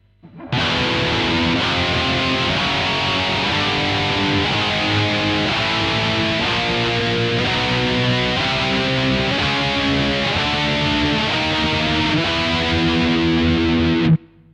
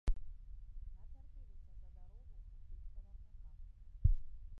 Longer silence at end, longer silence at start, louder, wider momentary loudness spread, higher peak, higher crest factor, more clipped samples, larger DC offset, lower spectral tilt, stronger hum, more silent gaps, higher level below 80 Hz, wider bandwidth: first, 0.3 s vs 0 s; first, 0.25 s vs 0.05 s; first, -17 LUFS vs -45 LUFS; second, 1 LU vs 22 LU; first, -6 dBFS vs -18 dBFS; second, 12 dB vs 22 dB; neither; neither; second, -5 dB/octave vs -9 dB/octave; neither; neither; first, -36 dBFS vs -44 dBFS; first, 11 kHz vs 2.7 kHz